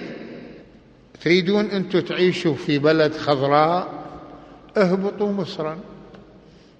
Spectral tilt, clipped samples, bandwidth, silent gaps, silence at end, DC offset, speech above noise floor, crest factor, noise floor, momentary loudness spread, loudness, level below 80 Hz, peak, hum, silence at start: -6.5 dB/octave; under 0.1%; 8.6 kHz; none; 0.6 s; under 0.1%; 29 dB; 20 dB; -49 dBFS; 20 LU; -20 LUFS; -58 dBFS; -2 dBFS; none; 0 s